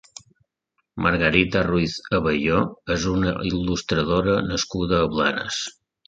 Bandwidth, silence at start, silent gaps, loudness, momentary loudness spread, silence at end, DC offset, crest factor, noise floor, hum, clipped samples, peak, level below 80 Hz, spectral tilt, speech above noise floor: 9.2 kHz; 0.95 s; none; -22 LUFS; 6 LU; 0.35 s; under 0.1%; 22 dB; -74 dBFS; none; under 0.1%; -2 dBFS; -40 dBFS; -5 dB/octave; 53 dB